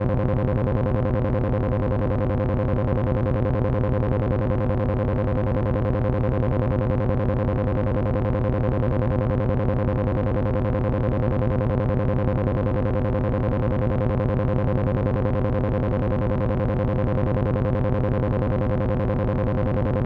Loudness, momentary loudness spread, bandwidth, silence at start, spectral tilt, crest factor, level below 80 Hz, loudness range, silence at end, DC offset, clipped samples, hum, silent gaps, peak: -23 LUFS; 1 LU; 4.7 kHz; 0 s; -11 dB/octave; 14 dB; -30 dBFS; 0 LU; 0 s; under 0.1%; under 0.1%; none; none; -8 dBFS